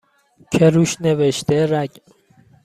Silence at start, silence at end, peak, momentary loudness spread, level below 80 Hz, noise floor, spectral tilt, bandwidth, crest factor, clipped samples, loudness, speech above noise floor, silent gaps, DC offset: 0.5 s; 0.75 s; -2 dBFS; 9 LU; -54 dBFS; -52 dBFS; -6 dB/octave; 14.5 kHz; 16 dB; under 0.1%; -17 LUFS; 36 dB; none; under 0.1%